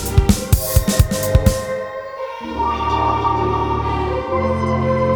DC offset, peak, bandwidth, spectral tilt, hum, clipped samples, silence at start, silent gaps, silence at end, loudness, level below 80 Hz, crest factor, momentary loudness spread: under 0.1%; 0 dBFS; over 20 kHz; -5.5 dB/octave; none; under 0.1%; 0 s; none; 0 s; -18 LUFS; -24 dBFS; 18 dB; 10 LU